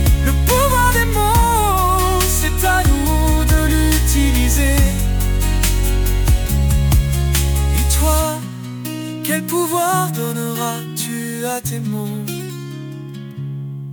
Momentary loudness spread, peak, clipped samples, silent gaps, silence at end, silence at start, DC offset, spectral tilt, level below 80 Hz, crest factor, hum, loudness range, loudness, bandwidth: 12 LU; -2 dBFS; under 0.1%; none; 0 s; 0 s; under 0.1%; -4.5 dB/octave; -18 dBFS; 12 dB; none; 7 LU; -17 LUFS; 19.5 kHz